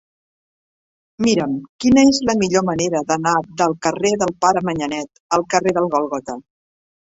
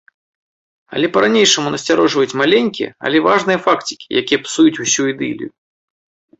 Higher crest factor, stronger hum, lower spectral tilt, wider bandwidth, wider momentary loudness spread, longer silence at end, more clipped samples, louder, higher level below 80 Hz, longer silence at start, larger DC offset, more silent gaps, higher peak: about the same, 18 dB vs 16 dB; neither; first, -4.5 dB/octave vs -3 dB/octave; about the same, 8 kHz vs 8.2 kHz; about the same, 11 LU vs 10 LU; second, 0.7 s vs 0.9 s; neither; second, -18 LUFS vs -15 LUFS; first, -50 dBFS vs -58 dBFS; first, 1.2 s vs 0.9 s; neither; first, 1.69-1.79 s, 5.20-5.29 s vs none; about the same, -2 dBFS vs 0 dBFS